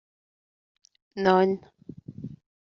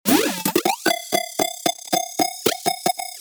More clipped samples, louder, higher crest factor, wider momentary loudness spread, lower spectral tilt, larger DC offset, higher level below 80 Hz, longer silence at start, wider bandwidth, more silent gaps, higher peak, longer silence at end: neither; second, -24 LUFS vs -21 LUFS; about the same, 22 dB vs 20 dB; first, 24 LU vs 5 LU; first, -5 dB/octave vs -2.5 dB/octave; neither; about the same, -66 dBFS vs -62 dBFS; first, 1.15 s vs 0.05 s; second, 6.4 kHz vs over 20 kHz; neither; second, -8 dBFS vs -2 dBFS; first, 0.4 s vs 0 s